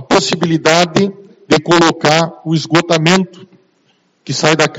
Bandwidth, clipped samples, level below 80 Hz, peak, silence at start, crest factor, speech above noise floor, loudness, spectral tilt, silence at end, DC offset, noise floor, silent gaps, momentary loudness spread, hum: 10.5 kHz; 0.2%; -52 dBFS; 0 dBFS; 0 s; 14 dB; 45 dB; -12 LUFS; -4.5 dB/octave; 0 s; under 0.1%; -57 dBFS; none; 7 LU; none